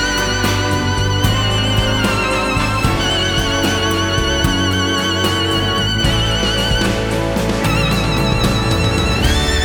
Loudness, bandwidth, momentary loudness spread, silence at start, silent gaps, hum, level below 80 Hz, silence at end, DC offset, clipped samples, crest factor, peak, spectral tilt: -15 LUFS; over 20 kHz; 1 LU; 0 s; none; none; -24 dBFS; 0 s; under 0.1%; under 0.1%; 14 dB; -2 dBFS; -4 dB/octave